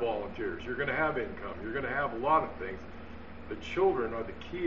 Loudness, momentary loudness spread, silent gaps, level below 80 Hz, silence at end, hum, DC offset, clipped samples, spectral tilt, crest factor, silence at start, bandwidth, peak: -32 LUFS; 16 LU; none; -52 dBFS; 0 s; none; 0.4%; under 0.1%; -4 dB/octave; 18 dB; 0 s; 7.2 kHz; -14 dBFS